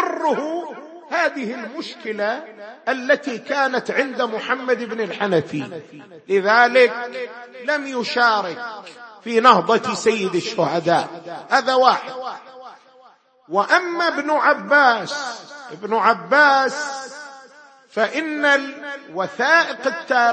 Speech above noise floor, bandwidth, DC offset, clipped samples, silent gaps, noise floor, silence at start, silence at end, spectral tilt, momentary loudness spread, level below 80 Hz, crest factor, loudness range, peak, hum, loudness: 32 dB; 8.8 kHz; under 0.1%; under 0.1%; none; -52 dBFS; 0 s; 0 s; -4 dB/octave; 18 LU; -72 dBFS; 20 dB; 5 LU; 0 dBFS; none; -19 LUFS